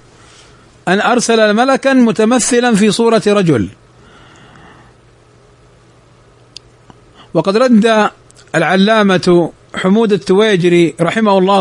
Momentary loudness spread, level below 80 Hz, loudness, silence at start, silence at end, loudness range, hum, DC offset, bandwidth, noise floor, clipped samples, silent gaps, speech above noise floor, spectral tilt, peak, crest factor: 7 LU; -52 dBFS; -11 LUFS; 0.85 s; 0 s; 9 LU; none; under 0.1%; 11 kHz; -45 dBFS; under 0.1%; none; 35 dB; -5 dB/octave; 0 dBFS; 12 dB